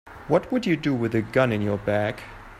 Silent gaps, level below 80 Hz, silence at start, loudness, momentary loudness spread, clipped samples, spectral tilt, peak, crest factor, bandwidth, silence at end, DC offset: none; -50 dBFS; 0.05 s; -24 LUFS; 4 LU; under 0.1%; -7.5 dB/octave; -6 dBFS; 18 dB; 14.5 kHz; 0 s; under 0.1%